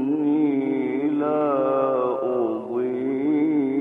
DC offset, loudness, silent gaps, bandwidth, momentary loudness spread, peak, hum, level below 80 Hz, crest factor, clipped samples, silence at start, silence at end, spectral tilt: under 0.1%; -23 LUFS; none; 3.8 kHz; 4 LU; -10 dBFS; none; -70 dBFS; 12 dB; under 0.1%; 0 s; 0 s; -9.5 dB/octave